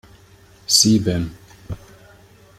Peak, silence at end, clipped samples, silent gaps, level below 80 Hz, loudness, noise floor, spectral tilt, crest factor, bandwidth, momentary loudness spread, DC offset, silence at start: 0 dBFS; 0.8 s; under 0.1%; none; -46 dBFS; -16 LUFS; -49 dBFS; -3.5 dB/octave; 22 dB; 16 kHz; 23 LU; under 0.1%; 0.7 s